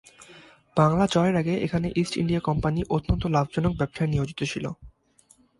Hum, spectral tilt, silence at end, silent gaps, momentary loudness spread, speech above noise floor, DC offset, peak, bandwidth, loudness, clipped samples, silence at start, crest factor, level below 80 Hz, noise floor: none; -7 dB/octave; 0.7 s; none; 8 LU; 36 dB; under 0.1%; -6 dBFS; 11.5 kHz; -25 LUFS; under 0.1%; 0.2 s; 20 dB; -42 dBFS; -60 dBFS